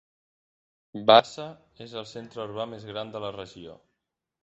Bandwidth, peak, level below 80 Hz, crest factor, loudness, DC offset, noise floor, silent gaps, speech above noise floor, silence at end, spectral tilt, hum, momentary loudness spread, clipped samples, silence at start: 8 kHz; -2 dBFS; -68 dBFS; 26 dB; -24 LUFS; under 0.1%; -84 dBFS; none; 57 dB; 0.7 s; -2 dB/octave; none; 25 LU; under 0.1%; 0.95 s